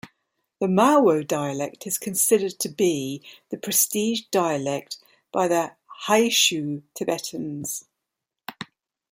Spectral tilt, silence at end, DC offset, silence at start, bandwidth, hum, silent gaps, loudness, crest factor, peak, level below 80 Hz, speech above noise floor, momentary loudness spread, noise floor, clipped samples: -3 dB/octave; 0.45 s; under 0.1%; 0.05 s; 16.5 kHz; none; none; -23 LUFS; 20 dB; -4 dBFS; -70 dBFS; 61 dB; 19 LU; -84 dBFS; under 0.1%